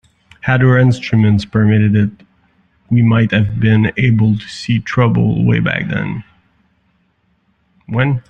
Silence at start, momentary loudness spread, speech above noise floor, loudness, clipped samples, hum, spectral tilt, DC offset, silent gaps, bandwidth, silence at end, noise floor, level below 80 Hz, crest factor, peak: 0.45 s; 9 LU; 47 dB; -14 LUFS; under 0.1%; none; -8 dB/octave; under 0.1%; none; 8.2 kHz; 0.1 s; -60 dBFS; -42 dBFS; 12 dB; -2 dBFS